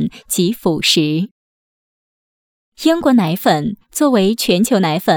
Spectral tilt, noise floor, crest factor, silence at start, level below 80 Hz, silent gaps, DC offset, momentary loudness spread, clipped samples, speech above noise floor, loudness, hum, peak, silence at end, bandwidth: -4.5 dB/octave; under -90 dBFS; 14 dB; 0 s; -52 dBFS; 1.31-2.72 s; under 0.1%; 6 LU; under 0.1%; over 76 dB; -15 LUFS; none; -2 dBFS; 0 s; over 20 kHz